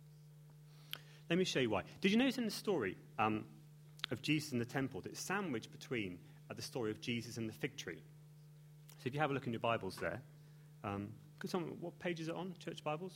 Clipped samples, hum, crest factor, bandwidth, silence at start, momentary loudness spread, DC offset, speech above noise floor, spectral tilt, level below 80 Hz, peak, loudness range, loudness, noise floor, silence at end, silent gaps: under 0.1%; none; 22 dB; 16.5 kHz; 0 s; 24 LU; under 0.1%; 20 dB; -5 dB/octave; -74 dBFS; -18 dBFS; 7 LU; -41 LUFS; -59 dBFS; 0 s; none